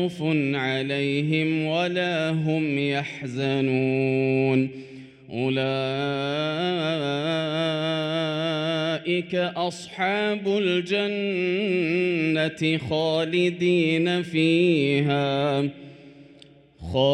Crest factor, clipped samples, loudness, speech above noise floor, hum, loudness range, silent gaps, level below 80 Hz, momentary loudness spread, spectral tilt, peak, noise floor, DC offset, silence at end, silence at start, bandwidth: 16 dB; under 0.1%; -24 LUFS; 28 dB; none; 3 LU; none; -60 dBFS; 6 LU; -6.5 dB/octave; -8 dBFS; -51 dBFS; under 0.1%; 0 s; 0 s; 11 kHz